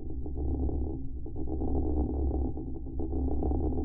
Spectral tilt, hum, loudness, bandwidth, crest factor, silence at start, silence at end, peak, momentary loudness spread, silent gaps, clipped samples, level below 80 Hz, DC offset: -14 dB/octave; none; -34 LUFS; 1.2 kHz; 12 dB; 0 s; 0 s; -18 dBFS; 8 LU; none; under 0.1%; -34 dBFS; under 0.1%